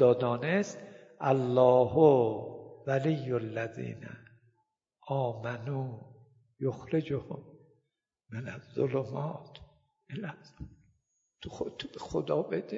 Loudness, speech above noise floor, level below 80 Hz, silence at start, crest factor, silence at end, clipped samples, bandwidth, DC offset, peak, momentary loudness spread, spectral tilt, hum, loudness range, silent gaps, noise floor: -31 LUFS; 54 dB; -64 dBFS; 0 s; 22 dB; 0 s; under 0.1%; 7.6 kHz; under 0.1%; -10 dBFS; 23 LU; -7.5 dB/octave; none; 11 LU; none; -83 dBFS